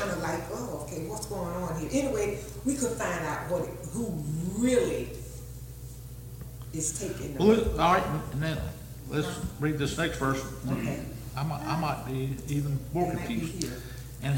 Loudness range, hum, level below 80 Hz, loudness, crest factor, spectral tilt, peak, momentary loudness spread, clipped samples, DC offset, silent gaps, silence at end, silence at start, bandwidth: 4 LU; none; -44 dBFS; -30 LUFS; 22 dB; -5.5 dB/octave; -8 dBFS; 16 LU; under 0.1%; under 0.1%; none; 0 s; 0 s; 17 kHz